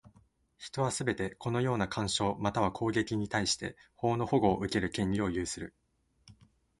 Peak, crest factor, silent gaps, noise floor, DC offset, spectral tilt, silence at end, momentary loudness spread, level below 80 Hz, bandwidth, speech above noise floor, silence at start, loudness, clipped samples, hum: -12 dBFS; 20 dB; none; -66 dBFS; under 0.1%; -5 dB/octave; 0.45 s; 9 LU; -54 dBFS; 11.5 kHz; 34 dB; 0.05 s; -32 LUFS; under 0.1%; none